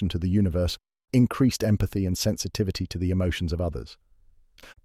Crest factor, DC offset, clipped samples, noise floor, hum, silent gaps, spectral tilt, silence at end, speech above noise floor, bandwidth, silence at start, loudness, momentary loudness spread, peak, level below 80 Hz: 16 dB; under 0.1%; under 0.1%; -57 dBFS; none; none; -6 dB/octave; 0.15 s; 32 dB; 15.5 kHz; 0 s; -26 LUFS; 8 LU; -10 dBFS; -40 dBFS